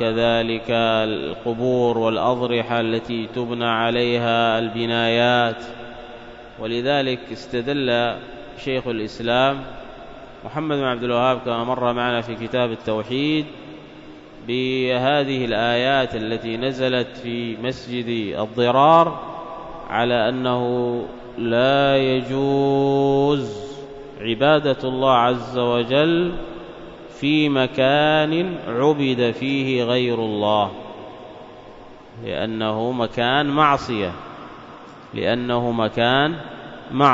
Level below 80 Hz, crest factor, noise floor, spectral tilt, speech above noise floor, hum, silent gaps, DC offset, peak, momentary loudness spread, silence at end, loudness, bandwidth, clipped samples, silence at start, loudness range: -50 dBFS; 18 dB; -41 dBFS; -6.5 dB/octave; 21 dB; none; none; under 0.1%; -2 dBFS; 19 LU; 0 s; -20 LUFS; 7.8 kHz; under 0.1%; 0 s; 4 LU